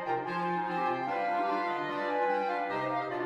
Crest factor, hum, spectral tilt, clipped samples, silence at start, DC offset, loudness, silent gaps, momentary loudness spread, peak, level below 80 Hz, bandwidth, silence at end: 12 dB; none; -6.5 dB/octave; under 0.1%; 0 s; under 0.1%; -31 LUFS; none; 3 LU; -18 dBFS; -76 dBFS; 10 kHz; 0 s